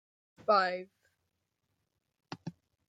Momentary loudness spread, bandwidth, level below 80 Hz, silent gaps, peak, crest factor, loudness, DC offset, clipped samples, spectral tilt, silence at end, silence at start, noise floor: 20 LU; 9 kHz; -86 dBFS; none; -14 dBFS; 22 dB; -31 LUFS; under 0.1%; under 0.1%; -5.5 dB/octave; 0.4 s; 0.5 s; -83 dBFS